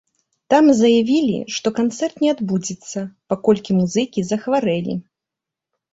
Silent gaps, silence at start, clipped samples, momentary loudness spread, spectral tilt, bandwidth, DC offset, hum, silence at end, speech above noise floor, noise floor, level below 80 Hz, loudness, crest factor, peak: none; 0.5 s; under 0.1%; 13 LU; -5.5 dB/octave; 8 kHz; under 0.1%; none; 0.9 s; 68 dB; -85 dBFS; -58 dBFS; -18 LUFS; 16 dB; -2 dBFS